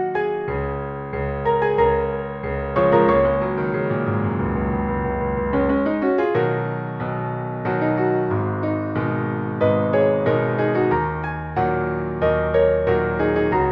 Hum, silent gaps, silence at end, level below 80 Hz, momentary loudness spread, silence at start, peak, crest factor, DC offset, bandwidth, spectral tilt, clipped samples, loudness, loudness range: none; none; 0 s; -36 dBFS; 8 LU; 0 s; -4 dBFS; 18 dB; under 0.1%; 5.6 kHz; -10.5 dB/octave; under 0.1%; -21 LUFS; 2 LU